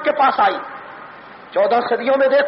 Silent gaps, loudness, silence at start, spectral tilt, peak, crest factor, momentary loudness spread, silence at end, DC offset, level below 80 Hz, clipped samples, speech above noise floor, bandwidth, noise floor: none; -17 LUFS; 0 s; -1 dB/octave; -6 dBFS; 12 dB; 21 LU; 0 s; under 0.1%; -66 dBFS; under 0.1%; 23 dB; 5.8 kHz; -38 dBFS